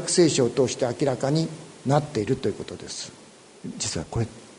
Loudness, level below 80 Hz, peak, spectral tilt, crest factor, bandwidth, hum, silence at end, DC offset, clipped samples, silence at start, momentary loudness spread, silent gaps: -25 LUFS; -52 dBFS; -6 dBFS; -5 dB/octave; 20 dB; 11 kHz; none; 0.05 s; under 0.1%; under 0.1%; 0 s; 15 LU; none